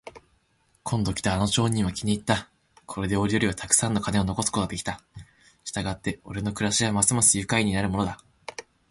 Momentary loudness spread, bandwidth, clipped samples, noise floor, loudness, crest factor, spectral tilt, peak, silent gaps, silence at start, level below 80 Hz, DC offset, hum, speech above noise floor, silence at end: 18 LU; 12 kHz; under 0.1%; -67 dBFS; -25 LUFS; 22 dB; -3.5 dB/octave; -4 dBFS; none; 0.05 s; -46 dBFS; under 0.1%; none; 42 dB; 0.3 s